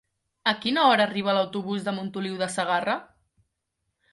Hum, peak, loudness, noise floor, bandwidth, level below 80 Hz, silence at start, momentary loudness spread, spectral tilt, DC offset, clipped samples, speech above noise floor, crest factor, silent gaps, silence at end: none; -6 dBFS; -25 LUFS; -79 dBFS; 11.5 kHz; -70 dBFS; 0.45 s; 11 LU; -4.5 dB/octave; under 0.1%; under 0.1%; 55 dB; 20 dB; none; 1.1 s